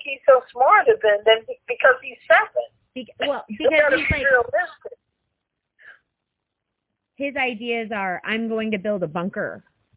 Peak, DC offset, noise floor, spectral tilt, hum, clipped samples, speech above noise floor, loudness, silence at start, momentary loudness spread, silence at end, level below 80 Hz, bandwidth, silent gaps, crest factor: -2 dBFS; under 0.1%; -80 dBFS; -8 dB/octave; none; under 0.1%; 60 dB; -20 LUFS; 0 s; 13 LU; 0.4 s; -48 dBFS; 4 kHz; none; 20 dB